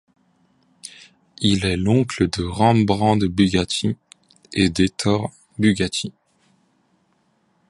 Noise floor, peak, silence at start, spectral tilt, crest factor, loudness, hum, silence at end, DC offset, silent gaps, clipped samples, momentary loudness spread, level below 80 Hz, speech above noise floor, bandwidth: -64 dBFS; -2 dBFS; 0.85 s; -5.5 dB/octave; 20 dB; -20 LUFS; none; 1.6 s; under 0.1%; none; under 0.1%; 15 LU; -42 dBFS; 45 dB; 11.5 kHz